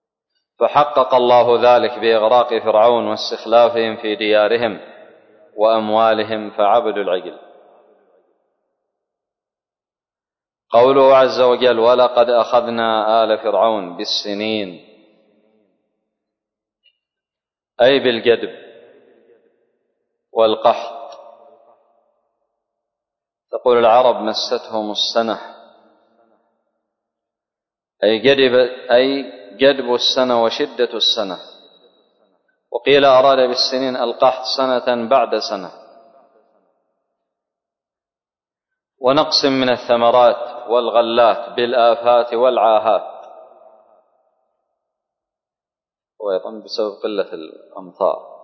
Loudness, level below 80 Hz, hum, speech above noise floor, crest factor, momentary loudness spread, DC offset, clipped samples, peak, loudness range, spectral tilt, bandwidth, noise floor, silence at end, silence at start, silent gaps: -15 LUFS; -64 dBFS; none; over 75 dB; 16 dB; 12 LU; under 0.1%; under 0.1%; -2 dBFS; 11 LU; -4 dB/octave; 6.4 kHz; under -90 dBFS; 0.15 s; 0.6 s; none